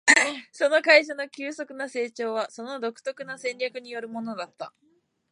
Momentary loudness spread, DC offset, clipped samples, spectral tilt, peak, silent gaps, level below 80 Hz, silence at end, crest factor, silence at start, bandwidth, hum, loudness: 17 LU; under 0.1%; under 0.1%; -1 dB/octave; -2 dBFS; none; -86 dBFS; 0.6 s; 24 dB; 0.05 s; 11.5 kHz; none; -25 LUFS